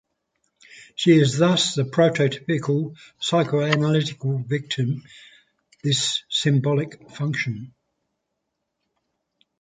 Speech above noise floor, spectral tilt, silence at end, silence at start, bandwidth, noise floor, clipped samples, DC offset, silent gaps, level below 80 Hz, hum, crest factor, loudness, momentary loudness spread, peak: 57 dB; -5 dB/octave; 1.9 s; 0.75 s; 9.4 kHz; -79 dBFS; under 0.1%; under 0.1%; none; -64 dBFS; none; 20 dB; -22 LUFS; 11 LU; -4 dBFS